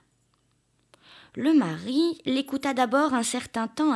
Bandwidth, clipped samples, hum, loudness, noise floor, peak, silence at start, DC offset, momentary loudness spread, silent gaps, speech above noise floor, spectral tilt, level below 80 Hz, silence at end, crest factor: 12 kHz; under 0.1%; none; -25 LUFS; -69 dBFS; -10 dBFS; 1.35 s; under 0.1%; 7 LU; none; 44 dB; -4 dB/octave; -70 dBFS; 0 s; 16 dB